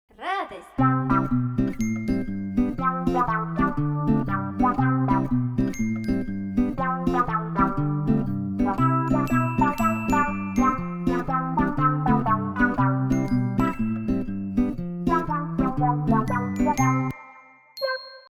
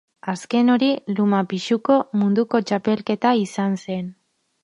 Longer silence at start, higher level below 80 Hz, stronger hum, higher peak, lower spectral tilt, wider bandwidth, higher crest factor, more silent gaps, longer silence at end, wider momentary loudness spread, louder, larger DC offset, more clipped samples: about the same, 0.2 s vs 0.25 s; first, -40 dBFS vs -68 dBFS; neither; second, -8 dBFS vs -4 dBFS; about the same, -7.5 dB/octave vs -6.5 dB/octave; first, 15 kHz vs 11 kHz; about the same, 16 dB vs 16 dB; neither; second, 0.1 s vs 0.5 s; second, 6 LU vs 11 LU; second, -24 LUFS vs -21 LUFS; neither; neither